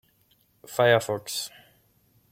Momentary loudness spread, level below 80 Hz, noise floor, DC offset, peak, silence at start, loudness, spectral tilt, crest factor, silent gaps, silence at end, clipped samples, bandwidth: 13 LU; -70 dBFS; -65 dBFS; under 0.1%; -6 dBFS; 0.7 s; -25 LUFS; -3.5 dB/octave; 22 dB; none; 0.85 s; under 0.1%; 16.5 kHz